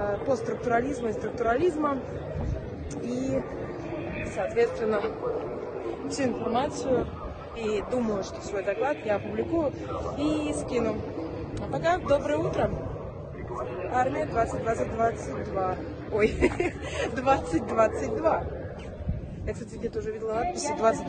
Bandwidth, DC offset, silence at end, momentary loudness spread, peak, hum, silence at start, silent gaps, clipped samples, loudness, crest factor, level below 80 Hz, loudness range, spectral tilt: 9.4 kHz; under 0.1%; 0 s; 10 LU; -10 dBFS; none; 0 s; none; under 0.1%; -29 LUFS; 20 dB; -44 dBFS; 3 LU; -6 dB/octave